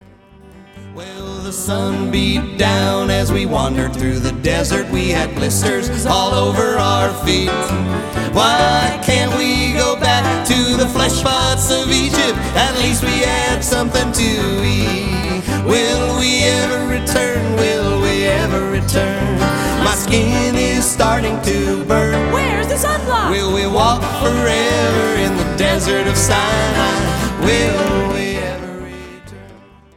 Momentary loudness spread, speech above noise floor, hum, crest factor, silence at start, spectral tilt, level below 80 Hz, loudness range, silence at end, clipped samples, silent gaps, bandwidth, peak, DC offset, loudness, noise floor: 5 LU; 28 dB; none; 16 dB; 0.45 s; -4 dB/octave; -28 dBFS; 2 LU; 0.4 s; under 0.1%; none; 17 kHz; 0 dBFS; under 0.1%; -15 LUFS; -43 dBFS